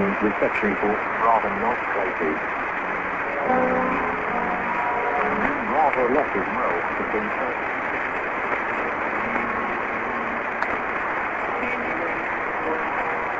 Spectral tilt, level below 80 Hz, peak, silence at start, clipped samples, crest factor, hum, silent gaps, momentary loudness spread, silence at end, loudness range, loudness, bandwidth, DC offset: -6.5 dB/octave; -50 dBFS; -4 dBFS; 0 s; under 0.1%; 18 dB; none; none; 5 LU; 0 s; 2 LU; -23 LUFS; 7.8 kHz; under 0.1%